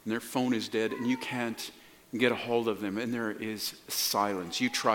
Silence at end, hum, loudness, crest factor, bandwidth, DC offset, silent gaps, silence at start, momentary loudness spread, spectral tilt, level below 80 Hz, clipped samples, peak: 0 s; none; -31 LUFS; 22 dB; 17.5 kHz; under 0.1%; none; 0.05 s; 7 LU; -3.5 dB/octave; -74 dBFS; under 0.1%; -10 dBFS